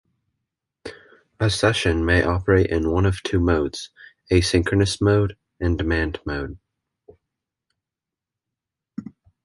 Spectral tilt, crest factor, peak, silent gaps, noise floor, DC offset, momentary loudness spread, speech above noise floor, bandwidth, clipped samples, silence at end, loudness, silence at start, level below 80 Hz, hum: -5.5 dB/octave; 20 dB; -4 dBFS; none; -87 dBFS; under 0.1%; 19 LU; 68 dB; 11.5 kHz; under 0.1%; 0.35 s; -21 LUFS; 0.85 s; -34 dBFS; none